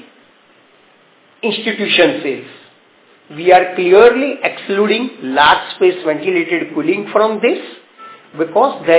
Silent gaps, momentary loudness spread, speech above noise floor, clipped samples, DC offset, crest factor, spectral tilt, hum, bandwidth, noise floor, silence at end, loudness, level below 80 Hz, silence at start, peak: none; 12 LU; 36 dB; 0.2%; under 0.1%; 14 dB; -8.5 dB/octave; none; 4 kHz; -50 dBFS; 0 s; -14 LUFS; -56 dBFS; 1.45 s; 0 dBFS